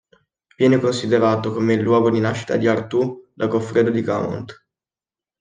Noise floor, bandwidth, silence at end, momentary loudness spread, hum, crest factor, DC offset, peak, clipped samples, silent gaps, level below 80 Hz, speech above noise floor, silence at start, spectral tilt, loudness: under -90 dBFS; 9.6 kHz; 0.9 s; 9 LU; none; 16 dB; under 0.1%; -4 dBFS; under 0.1%; none; -62 dBFS; over 72 dB; 0.6 s; -7 dB/octave; -19 LUFS